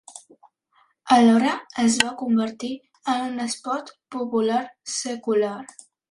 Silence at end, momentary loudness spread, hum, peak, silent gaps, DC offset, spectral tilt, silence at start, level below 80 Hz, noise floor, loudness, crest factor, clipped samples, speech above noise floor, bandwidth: 0.45 s; 15 LU; none; 0 dBFS; none; under 0.1%; -3.5 dB/octave; 0.1 s; -68 dBFS; -64 dBFS; -23 LUFS; 22 dB; under 0.1%; 41 dB; 11.5 kHz